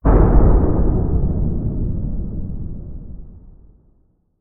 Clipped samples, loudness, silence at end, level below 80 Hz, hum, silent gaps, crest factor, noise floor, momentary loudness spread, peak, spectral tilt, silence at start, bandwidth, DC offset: under 0.1%; -19 LUFS; 0.9 s; -20 dBFS; none; none; 16 dB; -58 dBFS; 21 LU; 0 dBFS; -13 dB/octave; 0.05 s; 2.4 kHz; under 0.1%